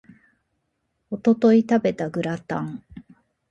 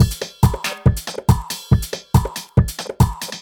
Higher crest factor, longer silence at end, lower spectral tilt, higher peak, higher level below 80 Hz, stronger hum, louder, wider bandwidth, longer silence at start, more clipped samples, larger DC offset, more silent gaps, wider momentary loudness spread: about the same, 18 dB vs 18 dB; first, 0.5 s vs 0 s; first, -7.5 dB/octave vs -5.5 dB/octave; second, -6 dBFS vs 0 dBFS; second, -60 dBFS vs -26 dBFS; neither; about the same, -21 LUFS vs -19 LUFS; second, 7.8 kHz vs 18.5 kHz; first, 1.1 s vs 0 s; neither; neither; neither; first, 17 LU vs 1 LU